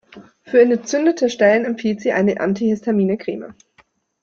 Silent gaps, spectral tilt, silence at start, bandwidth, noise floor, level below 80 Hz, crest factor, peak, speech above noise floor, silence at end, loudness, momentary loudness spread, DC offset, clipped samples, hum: none; -6 dB/octave; 0.15 s; 7.6 kHz; -57 dBFS; -62 dBFS; 16 dB; -2 dBFS; 40 dB; 0.7 s; -18 LUFS; 9 LU; under 0.1%; under 0.1%; none